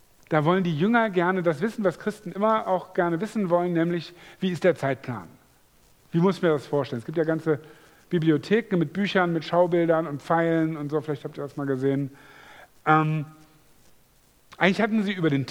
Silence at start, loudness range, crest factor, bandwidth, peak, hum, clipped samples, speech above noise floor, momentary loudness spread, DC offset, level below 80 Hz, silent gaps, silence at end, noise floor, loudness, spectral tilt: 0.3 s; 3 LU; 22 dB; 19 kHz; -4 dBFS; none; under 0.1%; 35 dB; 10 LU; under 0.1%; -66 dBFS; none; 0 s; -59 dBFS; -25 LUFS; -7.5 dB/octave